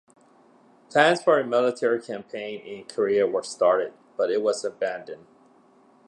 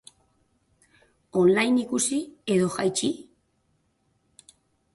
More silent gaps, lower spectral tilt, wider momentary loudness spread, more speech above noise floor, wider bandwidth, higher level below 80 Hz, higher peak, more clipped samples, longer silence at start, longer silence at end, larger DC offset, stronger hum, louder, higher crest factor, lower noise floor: neither; about the same, -4 dB/octave vs -4.5 dB/octave; first, 15 LU vs 10 LU; second, 33 dB vs 47 dB; about the same, 11 kHz vs 11.5 kHz; second, -76 dBFS vs -68 dBFS; first, -4 dBFS vs -10 dBFS; neither; second, 0.9 s vs 1.35 s; second, 0.9 s vs 1.75 s; neither; neither; about the same, -24 LUFS vs -24 LUFS; about the same, 22 dB vs 18 dB; second, -57 dBFS vs -70 dBFS